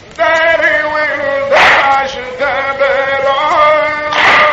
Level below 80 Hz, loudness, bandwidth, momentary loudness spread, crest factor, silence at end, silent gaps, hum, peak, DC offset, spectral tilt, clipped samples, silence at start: -44 dBFS; -10 LUFS; 9.8 kHz; 8 LU; 10 dB; 0 s; none; none; 0 dBFS; under 0.1%; -2.5 dB/octave; under 0.1%; 0.05 s